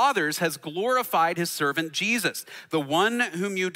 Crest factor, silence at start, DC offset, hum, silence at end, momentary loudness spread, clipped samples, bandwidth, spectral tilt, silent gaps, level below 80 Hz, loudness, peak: 16 dB; 0 s; under 0.1%; none; 0 s; 7 LU; under 0.1%; 16 kHz; -3.5 dB/octave; none; -78 dBFS; -25 LUFS; -10 dBFS